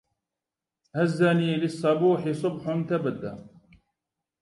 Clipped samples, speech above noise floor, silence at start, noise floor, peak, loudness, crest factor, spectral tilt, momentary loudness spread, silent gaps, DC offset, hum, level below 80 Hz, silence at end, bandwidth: under 0.1%; 64 dB; 0.95 s; -89 dBFS; -10 dBFS; -25 LUFS; 18 dB; -7.5 dB/octave; 14 LU; none; under 0.1%; none; -68 dBFS; 0.95 s; 11.5 kHz